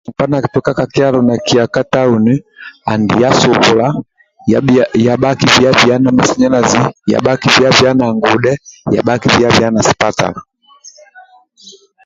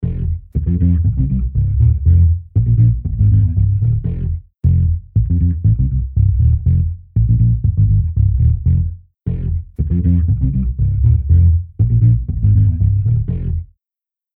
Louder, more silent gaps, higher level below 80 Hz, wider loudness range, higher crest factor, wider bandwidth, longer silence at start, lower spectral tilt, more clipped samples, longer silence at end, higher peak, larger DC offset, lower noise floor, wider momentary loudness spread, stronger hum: first, -11 LUFS vs -16 LUFS; neither; second, -42 dBFS vs -20 dBFS; about the same, 4 LU vs 2 LU; about the same, 12 dB vs 12 dB; first, 7.8 kHz vs 0.9 kHz; about the same, 0.1 s vs 0 s; second, -5 dB/octave vs -14.5 dB/octave; neither; second, 0.35 s vs 0.7 s; about the same, 0 dBFS vs -2 dBFS; neither; second, -42 dBFS vs -89 dBFS; about the same, 8 LU vs 8 LU; neither